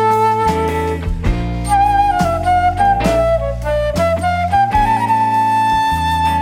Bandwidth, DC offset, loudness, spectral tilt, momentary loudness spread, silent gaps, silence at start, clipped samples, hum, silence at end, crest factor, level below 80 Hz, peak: 16 kHz; under 0.1%; -15 LUFS; -6 dB/octave; 6 LU; none; 0 s; under 0.1%; none; 0 s; 12 dB; -26 dBFS; -4 dBFS